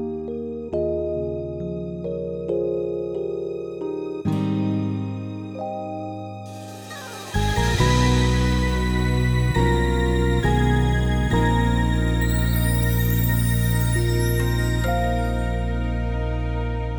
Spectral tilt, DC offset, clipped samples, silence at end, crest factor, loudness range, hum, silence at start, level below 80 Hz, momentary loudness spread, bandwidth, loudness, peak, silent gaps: -6 dB/octave; under 0.1%; under 0.1%; 0 s; 16 dB; 7 LU; none; 0 s; -28 dBFS; 11 LU; over 20 kHz; -23 LUFS; -6 dBFS; none